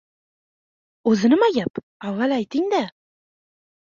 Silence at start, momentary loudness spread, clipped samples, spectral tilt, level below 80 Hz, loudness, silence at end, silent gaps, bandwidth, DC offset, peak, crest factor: 1.05 s; 13 LU; under 0.1%; -6 dB/octave; -66 dBFS; -21 LUFS; 1.05 s; 1.70-1.74 s, 1.83-2.00 s; 7.4 kHz; under 0.1%; -6 dBFS; 16 dB